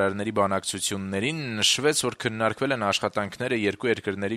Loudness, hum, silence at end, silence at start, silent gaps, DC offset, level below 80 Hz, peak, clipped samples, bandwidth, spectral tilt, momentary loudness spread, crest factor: -25 LUFS; none; 0 s; 0 s; none; under 0.1%; -62 dBFS; -8 dBFS; under 0.1%; 16 kHz; -3 dB/octave; 6 LU; 18 dB